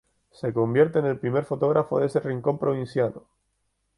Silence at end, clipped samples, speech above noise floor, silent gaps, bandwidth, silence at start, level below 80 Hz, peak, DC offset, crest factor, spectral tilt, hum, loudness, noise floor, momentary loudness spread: 0.8 s; under 0.1%; 50 dB; none; 11 kHz; 0.45 s; -62 dBFS; -6 dBFS; under 0.1%; 18 dB; -8.5 dB/octave; none; -25 LUFS; -74 dBFS; 6 LU